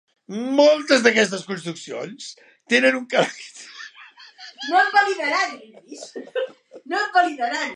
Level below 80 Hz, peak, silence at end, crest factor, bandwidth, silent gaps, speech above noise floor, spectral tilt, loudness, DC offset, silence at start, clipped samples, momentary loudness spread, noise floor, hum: -80 dBFS; -2 dBFS; 0 s; 20 dB; 11 kHz; none; 25 dB; -3 dB/octave; -20 LUFS; under 0.1%; 0.3 s; under 0.1%; 21 LU; -46 dBFS; none